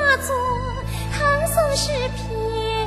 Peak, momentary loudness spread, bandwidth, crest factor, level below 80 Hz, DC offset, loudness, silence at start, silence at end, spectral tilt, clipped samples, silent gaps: -6 dBFS; 8 LU; 13 kHz; 16 dB; -32 dBFS; under 0.1%; -22 LUFS; 0 s; 0 s; -3.5 dB/octave; under 0.1%; none